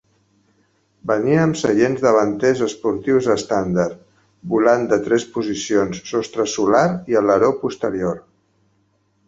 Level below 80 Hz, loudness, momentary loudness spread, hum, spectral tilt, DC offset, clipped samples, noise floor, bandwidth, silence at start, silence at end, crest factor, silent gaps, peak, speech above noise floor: -54 dBFS; -18 LUFS; 8 LU; none; -5.5 dB/octave; under 0.1%; under 0.1%; -63 dBFS; 8 kHz; 1.05 s; 1.1 s; 18 dB; none; 0 dBFS; 46 dB